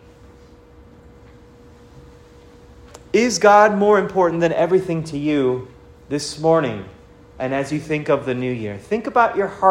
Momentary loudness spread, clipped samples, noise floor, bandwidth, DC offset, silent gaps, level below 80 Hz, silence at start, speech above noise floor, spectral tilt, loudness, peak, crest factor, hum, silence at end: 13 LU; under 0.1%; -46 dBFS; 14 kHz; under 0.1%; none; -52 dBFS; 1.95 s; 28 dB; -5.5 dB/octave; -18 LUFS; 0 dBFS; 20 dB; none; 0 s